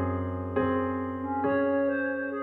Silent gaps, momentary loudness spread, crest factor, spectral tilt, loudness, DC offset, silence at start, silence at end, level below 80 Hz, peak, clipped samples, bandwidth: none; 6 LU; 14 dB; -10.5 dB/octave; -29 LUFS; under 0.1%; 0 s; 0 s; -56 dBFS; -14 dBFS; under 0.1%; 4.1 kHz